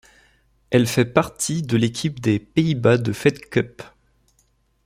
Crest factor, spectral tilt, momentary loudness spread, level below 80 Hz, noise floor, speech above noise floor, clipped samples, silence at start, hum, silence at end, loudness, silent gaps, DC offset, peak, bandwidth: 20 dB; -5.5 dB/octave; 6 LU; -54 dBFS; -64 dBFS; 44 dB; under 0.1%; 0.7 s; none; 1 s; -21 LUFS; none; under 0.1%; -2 dBFS; 16 kHz